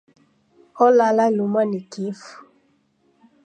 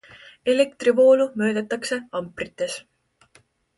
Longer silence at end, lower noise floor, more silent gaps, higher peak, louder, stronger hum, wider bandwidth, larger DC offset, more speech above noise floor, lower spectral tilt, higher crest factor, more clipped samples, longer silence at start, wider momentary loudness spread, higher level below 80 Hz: about the same, 1.05 s vs 0.95 s; first, -63 dBFS vs -59 dBFS; neither; about the same, -4 dBFS vs -6 dBFS; first, -19 LUFS vs -22 LUFS; neither; second, 9.2 kHz vs 11.5 kHz; neither; first, 44 dB vs 38 dB; first, -6.5 dB/octave vs -4.5 dB/octave; about the same, 18 dB vs 16 dB; neither; first, 0.75 s vs 0.45 s; about the same, 15 LU vs 14 LU; second, -78 dBFS vs -64 dBFS